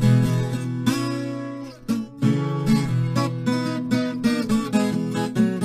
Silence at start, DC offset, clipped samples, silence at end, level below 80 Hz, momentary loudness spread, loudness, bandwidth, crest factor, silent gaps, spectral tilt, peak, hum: 0 s; under 0.1%; under 0.1%; 0 s; -48 dBFS; 7 LU; -23 LUFS; 15 kHz; 16 dB; none; -6.5 dB/octave; -6 dBFS; none